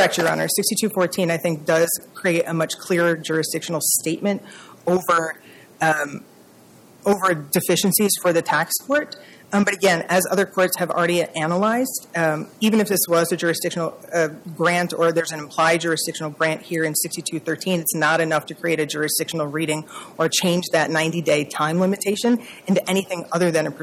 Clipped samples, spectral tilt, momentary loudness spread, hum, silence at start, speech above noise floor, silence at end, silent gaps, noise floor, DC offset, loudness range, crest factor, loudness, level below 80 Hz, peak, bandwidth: under 0.1%; -4 dB/octave; 7 LU; none; 0 s; 28 dB; 0 s; none; -49 dBFS; under 0.1%; 2 LU; 16 dB; -21 LUFS; -66 dBFS; -6 dBFS; 17 kHz